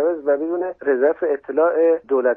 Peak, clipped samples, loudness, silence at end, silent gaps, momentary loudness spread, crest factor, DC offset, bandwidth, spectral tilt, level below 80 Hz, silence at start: -6 dBFS; under 0.1%; -19 LUFS; 0 s; none; 6 LU; 12 dB; under 0.1%; 3 kHz; -9 dB/octave; -66 dBFS; 0 s